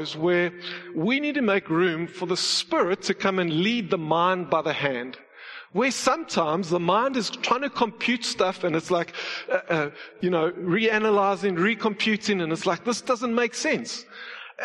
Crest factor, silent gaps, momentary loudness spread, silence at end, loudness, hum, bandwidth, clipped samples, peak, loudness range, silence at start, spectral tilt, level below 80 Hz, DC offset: 18 dB; none; 9 LU; 0 s; -24 LUFS; none; 12 kHz; under 0.1%; -6 dBFS; 2 LU; 0 s; -4 dB/octave; -68 dBFS; under 0.1%